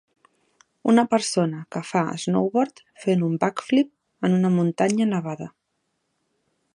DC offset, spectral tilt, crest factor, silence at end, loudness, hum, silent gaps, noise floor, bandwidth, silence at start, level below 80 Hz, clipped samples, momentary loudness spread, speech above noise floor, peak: under 0.1%; -6 dB/octave; 20 dB; 1.25 s; -23 LUFS; none; none; -75 dBFS; 11 kHz; 0.85 s; -70 dBFS; under 0.1%; 9 LU; 53 dB; -4 dBFS